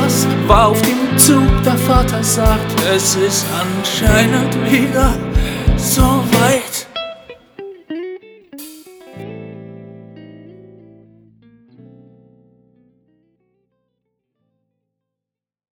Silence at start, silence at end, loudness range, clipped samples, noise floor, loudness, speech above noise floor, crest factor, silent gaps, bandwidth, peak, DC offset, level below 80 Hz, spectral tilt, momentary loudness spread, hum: 0 s; 5.2 s; 23 LU; under 0.1%; -86 dBFS; -13 LUFS; 73 dB; 16 dB; none; over 20 kHz; 0 dBFS; under 0.1%; -24 dBFS; -4.5 dB/octave; 23 LU; none